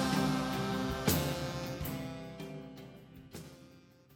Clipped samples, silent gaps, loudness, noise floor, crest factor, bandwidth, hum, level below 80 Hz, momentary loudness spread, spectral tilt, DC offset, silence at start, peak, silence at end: under 0.1%; none; -35 LUFS; -59 dBFS; 22 dB; 17.5 kHz; none; -52 dBFS; 20 LU; -5 dB/octave; under 0.1%; 0 s; -16 dBFS; 0 s